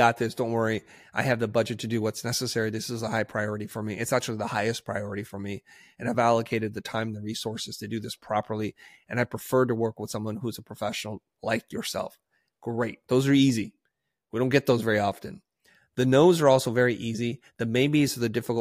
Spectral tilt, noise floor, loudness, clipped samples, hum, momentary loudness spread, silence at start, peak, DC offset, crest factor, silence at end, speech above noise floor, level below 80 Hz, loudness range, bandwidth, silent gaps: -5.5 dB/octave; -79 dBFS; -27 LUFS; under 0.1%; none; 13 LU; 0 s; -6 dBFS; under 0.1%; 20 dB; 0 s; 53 dB; -64 dBFS; 6 LU; 15.5 kHz; none